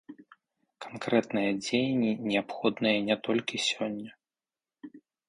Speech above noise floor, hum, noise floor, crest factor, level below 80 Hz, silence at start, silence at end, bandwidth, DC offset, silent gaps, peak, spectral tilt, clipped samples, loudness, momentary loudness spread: over 61 dB; none; under -90 dBFS; 20 dB; -72 dBFS; 0.1 s; 0.3 s; 11.5 kHz; under 0.1%; none; -12 dBFS; -4.5 dB/octave; under 0.1%; -29 LUFS; 20 LU